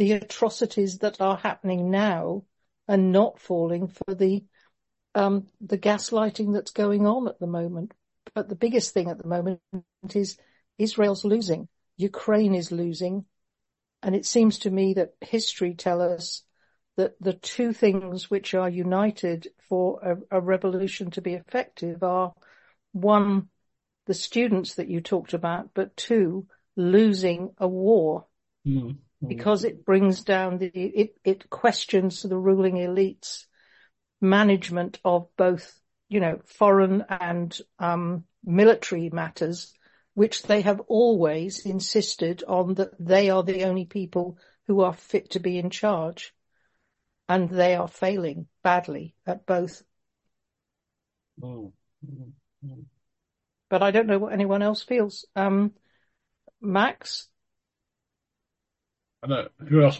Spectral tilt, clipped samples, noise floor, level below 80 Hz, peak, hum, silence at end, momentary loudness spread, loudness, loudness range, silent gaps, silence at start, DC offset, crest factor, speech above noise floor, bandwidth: -6 dB/octave; under 0.1%; -85 dBFS; -68 dBFS; -6 dBFS; none; 0 s; 14 LU; -25 LUFS; 5 LU; none; 0 s; under 0.1%; 20 dB; 61 dB; 8.4 kHz